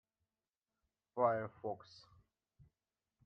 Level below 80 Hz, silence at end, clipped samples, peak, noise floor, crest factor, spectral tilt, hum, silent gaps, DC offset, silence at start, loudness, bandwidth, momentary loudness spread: -82 dBFS; 1.5 s; under 0.1%; -20 dBFS; under -90 dBFS; 24 dB; -7.5 dB/octave; none; none; under 0.1%; 1.15 s; -39 LUFS; 6.4 kHz; 15 LU